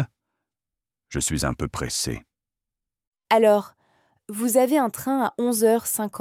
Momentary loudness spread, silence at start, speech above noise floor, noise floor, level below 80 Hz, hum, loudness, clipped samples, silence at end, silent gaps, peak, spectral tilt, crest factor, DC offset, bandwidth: 13 LU; 0 s; 67 dB; -89 dBFS; -46 dBFS; none; -22 LUFS; under 0.1%; 0 s; 3.07-3.12 s; -6 dBFS; -4.5 dB/octave; 18 dB; under 0.1%; 17 kHz